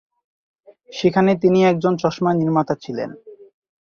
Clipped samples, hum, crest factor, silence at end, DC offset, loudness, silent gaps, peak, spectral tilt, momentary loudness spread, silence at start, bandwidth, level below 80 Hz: under 0.1%; none; 16 dB; 0.45 s; under 0.1%; -18 LUFS; none; -4 dBFS; -7.5 dB/octave; 13 LU; 0.9 s; 7 kHz; -60 dBFS